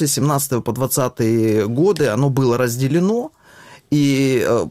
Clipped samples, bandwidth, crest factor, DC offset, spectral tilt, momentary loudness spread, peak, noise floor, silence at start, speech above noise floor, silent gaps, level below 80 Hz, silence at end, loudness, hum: under 0.1%; 16 kHz; 12 dB; under 0.1%; -5.5 dB/octave; 5 LU; -4 dBFS; -44 dBFS; 0 s; 28 dB; none; -52 dBFS; 0 s; -17 LUFS; none